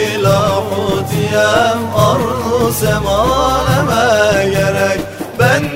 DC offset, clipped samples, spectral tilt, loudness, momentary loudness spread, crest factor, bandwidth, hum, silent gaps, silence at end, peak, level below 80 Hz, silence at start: under 0.1%; under 0.1%; -5 dB/octave; -13 LUFS; 5 LU; 12 dB; 16.5 kHz; none; none; 0 s; 0 dBFS; -32 dBFS; 0 s